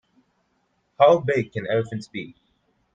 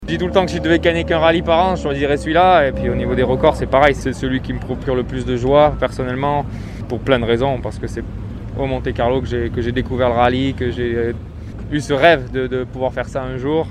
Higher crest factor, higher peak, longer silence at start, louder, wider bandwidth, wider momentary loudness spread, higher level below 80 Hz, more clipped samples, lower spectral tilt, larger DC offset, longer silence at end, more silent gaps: first, 22 dB vs 16 dB; about the same, -2 dBFS vs 0 dBFS; first, 1 s vs 0 s; second, -21 LUFS vs -17 LUFS; second, 9 kHz vs 12.5 kHz; first, 18 LU vs 11 LU; second, -64 dBFS vs -32 dBFS; neither; about the same, -7 dB/octave vs -6.5 dB/octave; neither; first, 0.65 s vs 0 s; neither